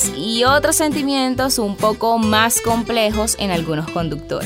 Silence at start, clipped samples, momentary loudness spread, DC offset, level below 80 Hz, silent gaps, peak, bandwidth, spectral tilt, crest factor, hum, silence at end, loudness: 0 s; under 0.1%; 7 LU; under 0.1%; -38 dBFS; none; 0 dBFS; 16 kHz; -3 dB/octave; 16 dB; none; 0 s; -17 LUFS